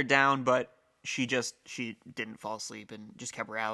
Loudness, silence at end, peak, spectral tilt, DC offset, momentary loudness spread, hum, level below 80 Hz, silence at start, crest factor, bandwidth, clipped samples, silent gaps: -32 LUFS; 0 s; -8 dBFS; -3.5 dB/octave; under 0.1%; 17 LU; none; -76 dBFS; 0 s; 24 dB; 12.5 kHz; under 0.1%; none